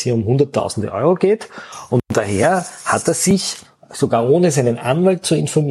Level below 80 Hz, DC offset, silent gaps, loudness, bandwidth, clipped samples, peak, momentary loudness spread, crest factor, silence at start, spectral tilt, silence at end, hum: -52 dBFS; under 0.1%; none; -17 LUFS; 13.5 kHz; under 0.1%; -2 dBFS; 8 LU; 14 dB; 0 s; -5.5 dB/octave; 0 s; none